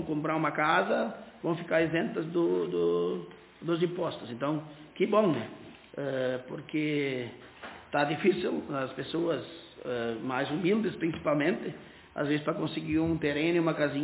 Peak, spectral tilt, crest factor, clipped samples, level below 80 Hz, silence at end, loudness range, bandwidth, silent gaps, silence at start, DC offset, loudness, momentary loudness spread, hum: -12 dBFS; -5 dB/octave; 18 dB; under 0.1%; -62 dBFS; 0 s; 2 LU; 4 kHz; none; 0 s; under 0.1%; -30 LUFS; 14 LU; none